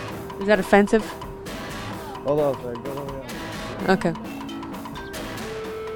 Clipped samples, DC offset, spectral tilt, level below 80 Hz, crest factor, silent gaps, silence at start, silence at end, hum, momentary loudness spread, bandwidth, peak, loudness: under 0.1%; under 0.1%; -5.5 dB/octave; -46 dBFS; 22 dB; none; 0 s; 0 s; none; 16 LU; 19.5 kHz; -4 dBFS; -25 LUFS